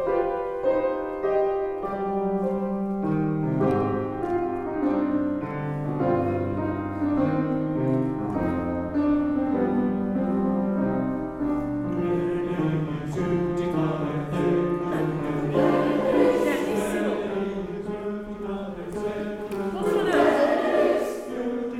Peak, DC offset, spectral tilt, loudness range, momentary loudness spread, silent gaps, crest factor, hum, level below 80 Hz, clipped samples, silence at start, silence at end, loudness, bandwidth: -6 dBFS; under 0.1%; -8 dB/octave; 3 LU; 8 LU; none; 18 dB; none; -50 dBFS; under 0.1%; 0 s; 0 s; -25 LUFS; 14.5 kHz